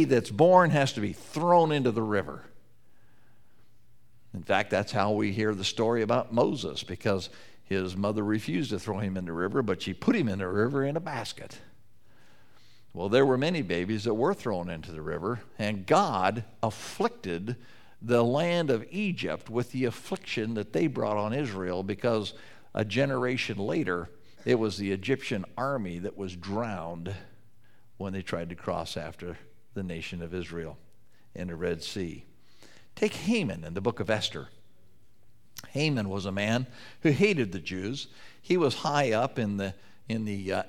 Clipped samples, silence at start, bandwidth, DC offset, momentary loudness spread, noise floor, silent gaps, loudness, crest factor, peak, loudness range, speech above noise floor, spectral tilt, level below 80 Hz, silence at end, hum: under 0.1%; 0 s; 16 kHz; 0.4%; 14 LU; -64 dBFS; none; -29 LUFS; 22 dB; -6 dBFS; 8 LU; 36 dB; -6 dB/octave; -62 dBFS; 0 s; none